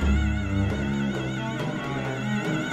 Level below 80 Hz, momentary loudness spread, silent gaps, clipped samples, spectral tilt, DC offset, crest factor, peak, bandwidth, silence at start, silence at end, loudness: -32 dBFS; 4 LU; none; under 0.1%; -6.5 dB/octave; under 0.1%; 14 dB; -12 dBFS; 12 kHz; 0 s; 0 s; -27 LUFS